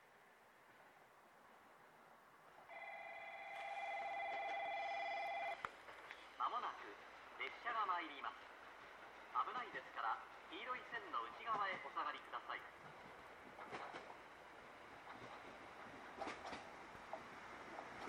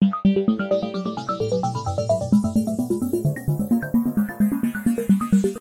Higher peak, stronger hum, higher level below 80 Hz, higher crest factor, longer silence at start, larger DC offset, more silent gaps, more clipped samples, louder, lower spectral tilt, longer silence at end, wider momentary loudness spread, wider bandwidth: second, -28 dBFS vs -8 dBFS; neither; second, -82 dBFS vs -48 dBFS; first, 22 dB vs 14 dB; about the same, 0 s vs 0 s; neither; neither; neither; second, -48 LUFS vs -22 LUFS; second, -3 dB/octave vs -7.5 dB/octave; about the same, 0 s vs 0 s; first, 22 LU vs 6 LU; first, 18 kHz vs 16 kHz